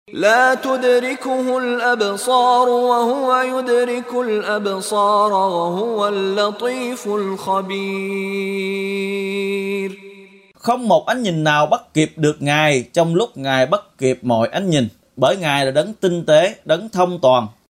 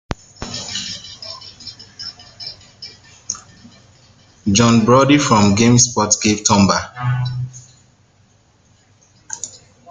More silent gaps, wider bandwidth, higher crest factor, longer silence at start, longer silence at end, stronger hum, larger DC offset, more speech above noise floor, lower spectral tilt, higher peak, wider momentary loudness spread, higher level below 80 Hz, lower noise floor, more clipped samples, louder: neither; first, 16 kHz vs 10 kHz; about the same, 16 dB vs 18 dB; about the same, 0.1 s vs 0.1 s; second, 0.2 s vs 0.35 s; neither; neither; second, 27 dB vs 41 dB; about the same, -5 dB/octave vs -4 dB/octave; about the same, -2 dBFS vs 0 dBFS; second, 8 LU vs 20 LU; second, -62 dBFS vs -46 dBFS; second, -44 dBFS vs -54 dBFS; neither; second, -18 LUFS vs -15 LUFS